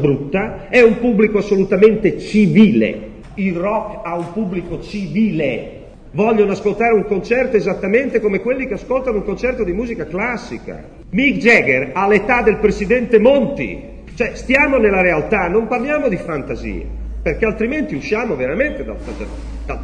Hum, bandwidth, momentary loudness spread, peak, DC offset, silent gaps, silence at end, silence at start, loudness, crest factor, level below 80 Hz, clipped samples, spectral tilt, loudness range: none; 9.6 kHz; 15 LU; 0 dBFS; under 0.1%; none; 0 s; 0 s; -16 LUFS; 16 dB; -34 dBFS; under 0.1%; -7 dB/octave; 6 LU